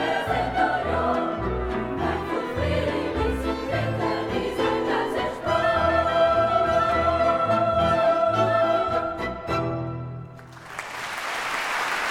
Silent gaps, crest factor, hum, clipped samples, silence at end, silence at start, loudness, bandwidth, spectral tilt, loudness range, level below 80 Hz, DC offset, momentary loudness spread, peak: none; 16 dB; none; under 0.1%; 0 s; 0 s; -24 LUFS; 16 kHz; -5.5 dB/octave; 5 LU; -42 dBFS; under 0.1%; 10 LU; -8 dBFS